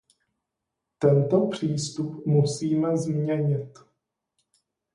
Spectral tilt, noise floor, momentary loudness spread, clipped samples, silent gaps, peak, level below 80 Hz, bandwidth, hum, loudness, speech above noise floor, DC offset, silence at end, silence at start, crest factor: -7 dB/octave; -84 dBFS; 9 LU; under 0.1%; none; -8 dBFS; -66 dBFS; 11 kHz; none; -25 LUFS; 60 dB; under 0.1%; 1.25 s; 1 s; 18 dB